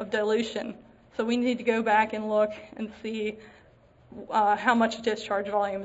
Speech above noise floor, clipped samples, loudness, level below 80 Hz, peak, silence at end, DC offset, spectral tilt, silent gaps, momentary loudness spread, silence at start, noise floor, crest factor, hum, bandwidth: 30 dB; under 0.1%; -27 LUFS; -64 dBFS; -8 dBFS; 0 s; under 0.1%; -4.5 dB/octave; none; 14 LU; 0 s; -57 dBFS; 20 dB; none; 8 kHz